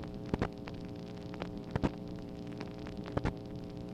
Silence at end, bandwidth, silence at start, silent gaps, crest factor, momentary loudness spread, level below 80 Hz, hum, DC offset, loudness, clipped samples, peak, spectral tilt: 0 s; 15 kHz; 0 s; none; 24 dB; 8 LU; -50 dBFS; none; under 0.1%; -40 LUFS; under 0.1%; -16 dBFS; -7.5 dB/octave